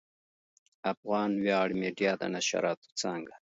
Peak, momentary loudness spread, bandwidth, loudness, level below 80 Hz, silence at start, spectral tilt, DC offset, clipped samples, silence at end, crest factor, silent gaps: -14 dBFS; 8 LU; 8 kHz; -31 LUFS; -74 dBFS; 0.85 s; -4 dB/octave; under 0.1%; under 0.1%; 0.2 s; 18 dB; 0.97-1.03 s, 2.77-2.82 s, 2.92-2.96 s